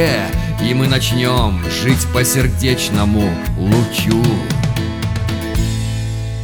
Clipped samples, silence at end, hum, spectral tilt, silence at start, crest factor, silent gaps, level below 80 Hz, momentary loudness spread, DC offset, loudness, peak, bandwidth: under 0.1%; 0 s; none; -5 dB/octave; 0 s; 16 dB; none; -26 dBFS; 6 LU; under 0.1%; -16 LUFS; 0 dBFS; over 20 kHz